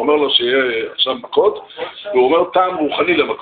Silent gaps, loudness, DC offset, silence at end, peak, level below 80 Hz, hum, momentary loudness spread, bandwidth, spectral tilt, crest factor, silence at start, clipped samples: none; -15 LUFS; under 0.1%; 0 s; -2 dBFS; -58 dBFS; none; 6 LU; 4.7 kHz; -0.5 dB/octave; 14 dB; 0 s; under 0.1%